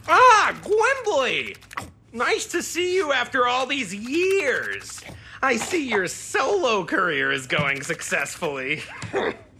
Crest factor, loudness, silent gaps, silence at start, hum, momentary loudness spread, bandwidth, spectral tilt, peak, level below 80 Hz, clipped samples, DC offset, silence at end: 20 dB; -22 LUFS; none; 0.05 s; none; 9 LU; 15.5 kHz; -3 dB/octave; -4 dBFS; -58 dBFS; under 0.1%; under 0.1%; 0.15 s